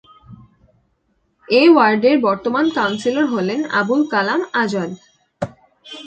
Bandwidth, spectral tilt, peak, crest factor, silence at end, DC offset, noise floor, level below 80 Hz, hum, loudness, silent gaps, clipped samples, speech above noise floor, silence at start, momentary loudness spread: 8.8 kHz; -5.5 dB/octave; 0 dBFS; 18 dB; 0 s; under 0.1%; -65 dBFS; -58 dBFS; none; -16 LUFS; none; under 0.1%; 49 dB; 0.3 s; 18 LU